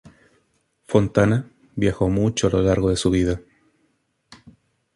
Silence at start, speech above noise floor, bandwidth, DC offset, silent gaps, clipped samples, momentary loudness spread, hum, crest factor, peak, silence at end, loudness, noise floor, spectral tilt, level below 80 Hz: 0.9 s; 49 dB; 11.5 kHz; under 0.1%; none; under 0.1%; 6 LU; none; 20 dB; -2 dBFS; 1.55 s; -21 LUFS; -68 dBFS; -6 dB/octave; -40 dBFS